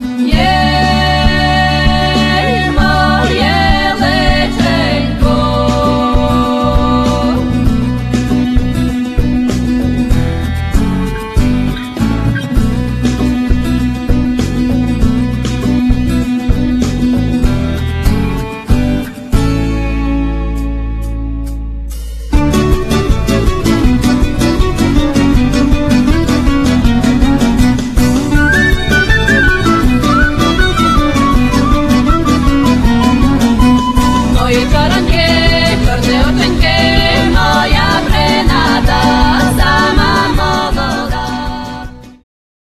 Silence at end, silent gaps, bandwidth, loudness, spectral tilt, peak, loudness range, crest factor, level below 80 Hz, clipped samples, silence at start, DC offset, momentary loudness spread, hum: 0.55 s; none; 14 kHz; -12 LUFS; -5.5 dB/octave; 0 dBFS; 4 LU; 10 dB; -16 dBFS; under 0.1%; 0 s; under 0.1%; 6 LU; none